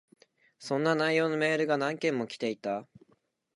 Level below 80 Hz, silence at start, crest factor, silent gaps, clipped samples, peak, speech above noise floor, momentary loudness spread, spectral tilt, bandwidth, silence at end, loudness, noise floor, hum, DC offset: -82 dBFS; 0.6 s; 18 dB; none; under 0.1%; -12 dBFS; 41 dB; 9 LU; -5.5 dB/octave; 11.5 kHz; 0.75 s; -29 LUFS; -70 dBFS; none; under 0.1%